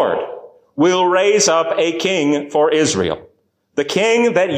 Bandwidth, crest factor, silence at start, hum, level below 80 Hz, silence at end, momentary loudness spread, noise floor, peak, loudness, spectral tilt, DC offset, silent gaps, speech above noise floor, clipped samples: 15.5 kHz; 12 dB; 0 s; none; -52 dBFS; 0 s; 13 LU; -58 dBFS; -4 dBFS; -16 LUFS; -3.5 dB/octave; under 0.1%; none; 43 dB; under 0.1%